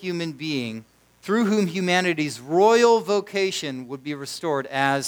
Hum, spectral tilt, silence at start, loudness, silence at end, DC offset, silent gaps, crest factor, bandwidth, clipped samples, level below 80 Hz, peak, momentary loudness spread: none; -4.5 dB/octave; 0 s; -22 LUFS; 0 s; under 0.1%; none; 18 dB; over 20 kHz; under 0.1%; -70 dBFS; -6 dBFS; 15 LU